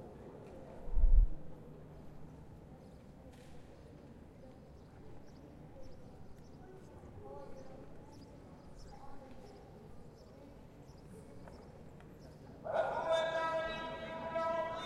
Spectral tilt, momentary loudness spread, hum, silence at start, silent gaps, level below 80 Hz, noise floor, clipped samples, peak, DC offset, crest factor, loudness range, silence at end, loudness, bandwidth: -6 dB/octave; 22 LU; none; 0 s; none; -42 dBFS; -55 dBFS; under 0.1%; -14 dBFS; under 0.1%; 24 dB; 17 LU; 0 s; -39 LUFS; 9 kHz